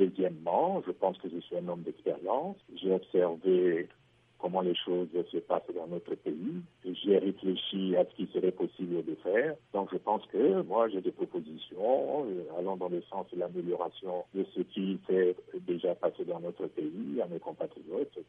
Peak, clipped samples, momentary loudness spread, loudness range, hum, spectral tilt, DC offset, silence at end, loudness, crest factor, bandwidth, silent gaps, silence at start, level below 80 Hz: -14 dBFS; under 0.1%; 10 LU; 3 LU; none; -9 dB/octave; under 0.1%; 0.05 s; -33 LUFS; 18 dB; 3.8 kHz; none; 0 s; -80 dBFS